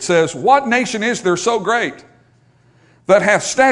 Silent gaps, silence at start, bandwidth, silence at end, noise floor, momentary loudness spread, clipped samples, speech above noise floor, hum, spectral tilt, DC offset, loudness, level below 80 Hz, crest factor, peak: none; 0 s; 11 kHz; 0 s; -53 dBFS; 6 LU; under 0.1%; 38 dB; none; -3.5 dB/octave; under 0.1%; -15 LUFS; -58 dBFS; 16 dB; 0 dBFS